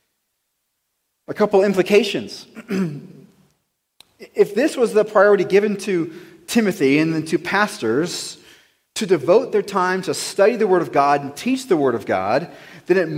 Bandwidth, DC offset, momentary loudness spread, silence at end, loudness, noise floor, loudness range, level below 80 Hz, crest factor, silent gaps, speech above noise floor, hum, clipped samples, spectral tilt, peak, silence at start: 16 kHz; under 0.1%; 13 LU; 0 s; -18 LUFS; -73 dBFS; 4 LU; -66 dBFS; 18 dB; none; 55 dB; none; under 0.1%; -5 dB/octave; -2 dBFS; 1.3 s